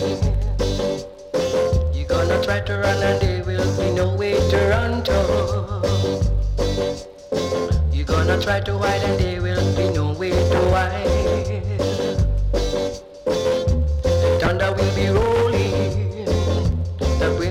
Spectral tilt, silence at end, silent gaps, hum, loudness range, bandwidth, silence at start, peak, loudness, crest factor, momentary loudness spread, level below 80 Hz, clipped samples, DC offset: -6 dB/octave; 0 s; none; none; 2 LU; 14 kHz; 0 s; -4 dBFS; -21 LUFS; 16 dB; 5 LU; -26 dBFS; under 0.1%; under 0.1%